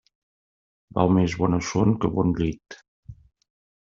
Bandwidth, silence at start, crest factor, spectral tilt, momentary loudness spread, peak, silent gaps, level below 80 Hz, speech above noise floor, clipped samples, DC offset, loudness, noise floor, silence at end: 7.6 kHz; 0.95 s; 22 dB; -7 dB/octave; 11 LU; -4 dBFS; 2.88-3.03 s; -48 dBFS; over 68 dB; under 0.1%; under 0.1%; -23 LUFS; under -90 dBFS; 0.75 s